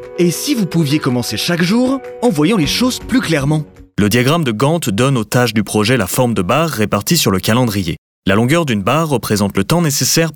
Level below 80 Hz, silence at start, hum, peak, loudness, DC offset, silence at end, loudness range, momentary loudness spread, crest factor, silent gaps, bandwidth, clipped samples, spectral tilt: -42 dBFS; 0 s; none; -2 dBFS; -14 LUFS; under 0.1%; 0 s; 1 LU; 4 LU; 12 dB; 7.98-8.23 s; over 20 kHz; under 0.1%; -5 dB/octave